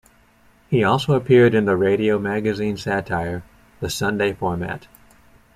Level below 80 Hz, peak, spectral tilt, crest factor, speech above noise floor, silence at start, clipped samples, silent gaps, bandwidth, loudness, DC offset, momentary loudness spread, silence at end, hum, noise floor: -50 dBFS; -4 dBFS; -6.5 dB/octave; 18 dB; 36 dB; 0.7 s; under 0.1%; none; 15 kHz; -20 LUFS; under 0.1%; 14 LU; 0.75 s; none; -55 dBFS